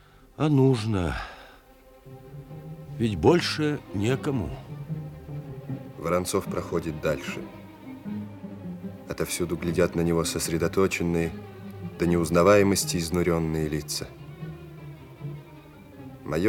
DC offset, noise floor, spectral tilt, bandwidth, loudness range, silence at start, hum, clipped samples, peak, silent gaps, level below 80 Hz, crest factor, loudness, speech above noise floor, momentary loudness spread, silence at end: under 0.1%; -53 dBFS; -5.5 dB/octave; 18 kHz; 7 LU; 0.4 s; none; under 0.1%; -8 dBFS; none; -50 dBFS; 20 dB; -26 LUFS; 28 dB; 21 LU; 0 s